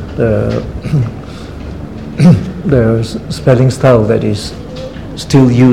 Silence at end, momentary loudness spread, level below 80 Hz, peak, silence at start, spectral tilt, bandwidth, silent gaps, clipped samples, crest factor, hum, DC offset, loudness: 0 s; 17 LU; -30 dBFS; 0 dBFS; 0 s; -7.5 dB/octave; 12 kHz; none; 0.5%; 12 dB; none; 0.8%; -11 LUFS